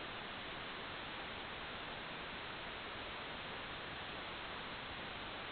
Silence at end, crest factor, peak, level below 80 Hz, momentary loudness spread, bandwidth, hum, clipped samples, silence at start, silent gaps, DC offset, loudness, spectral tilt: 0 s; 14 dB; -34 dBFS; -64 dBFS; 0 LU; 4.6 kHz; none; under 0.1%; 0 s; none; under 0.1%; -46 LUFS; -1 dB/octave